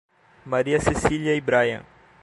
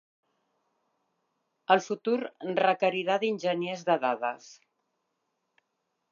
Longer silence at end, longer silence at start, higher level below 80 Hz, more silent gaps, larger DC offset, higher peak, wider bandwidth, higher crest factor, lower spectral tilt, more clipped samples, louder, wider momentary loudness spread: second, 0.4 s vs 1.6 s; second, 0.45 s vs 1.7 s; first, -42 dBFS vs -88 dBFS; neither; neither; about the same, -4 dBFS vs -6 dBFS; first, 11.5 kHz vs 7.4 kHz; about the same, 20 dB vs 24 dB; about the same, -5.5 dB/octave vs -5 dB/octave; neither; first, -22 LUFS vs -28 LUFS; about the same, 6 LU vs 7 LU